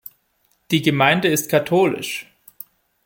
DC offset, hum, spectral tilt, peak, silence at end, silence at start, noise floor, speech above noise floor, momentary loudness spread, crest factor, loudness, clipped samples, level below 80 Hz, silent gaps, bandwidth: under 0.1%; none; -4.5 dB/octave; -2 dBFS; 0.85 s; 0.7 s; -65 dBFS; 47 dB; 23 LU; 18 dB; -18 LUFS; under 0.1%; -60 dBFS; none; 17 kHz